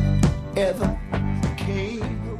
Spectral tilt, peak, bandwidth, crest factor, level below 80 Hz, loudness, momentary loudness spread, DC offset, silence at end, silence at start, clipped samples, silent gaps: -7 dB/octave; -6 dBFS; 14.5 kHz; 16 dB; -30 dBFS; -25 LUFS; 5 LU; under 0.1%; 0 s; 0 s; under 0.1%; none